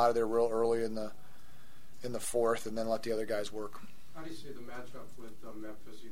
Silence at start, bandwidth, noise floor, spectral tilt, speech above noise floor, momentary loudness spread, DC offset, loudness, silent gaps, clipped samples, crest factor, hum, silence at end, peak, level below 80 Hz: 0 s; 16 kHz; -60 dBFS; -4.5 dB/octave; 25 dB; 20 LU; 1%; -34 LUFS; none; under 0.1%; 20 dB; none; 0 s; -14 dBFS; -64 dBFS